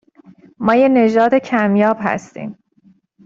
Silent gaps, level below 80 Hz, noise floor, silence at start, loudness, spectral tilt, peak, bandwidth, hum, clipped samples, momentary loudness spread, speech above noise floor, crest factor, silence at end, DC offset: none; -58 dBFS; -53 dBFS; 0.6 s; -15 LUFS; -7 dB/octave; -2 dBFS; 7.6 kHz; none; under 0.1%; 18 LU; 39 dB; 14 dB; 0.75 s; under 0.1%